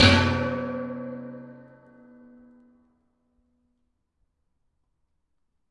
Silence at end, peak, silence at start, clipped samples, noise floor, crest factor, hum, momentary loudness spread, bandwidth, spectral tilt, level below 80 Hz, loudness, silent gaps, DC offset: 4.1 s; -2 dBFS; 0 s; under 0.1%; -77 dBFS; 26 dB; none; 23 LU; 11 kHz; -5 dB/octave; -54 dBFS; -25 LUFS; none; under 0.1%